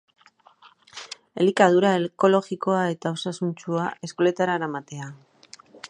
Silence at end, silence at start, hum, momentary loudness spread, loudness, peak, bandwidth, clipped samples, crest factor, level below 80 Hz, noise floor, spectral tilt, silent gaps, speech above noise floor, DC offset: 0.05 s; 0.95 s; none; 20 LU; -23 LUFS; -2 dBFS; 10.5 kHz; under 0.1%; 22 dB; -74 dBFS; -55 dBFS; -6 dB/octave; none; 32 dB; under 0.1%